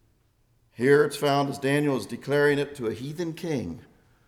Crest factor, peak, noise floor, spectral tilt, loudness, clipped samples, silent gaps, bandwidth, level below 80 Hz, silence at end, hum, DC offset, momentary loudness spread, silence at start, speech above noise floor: 18 dB; -8 dBFS; -65 dBFS; -6 dB/octave; -25 LUFS; under 0.1%; none; 16 kHz; -62 dBFS; 0.45 s; none; under 0.1%; 11 LU; 0.8 s; 41 dB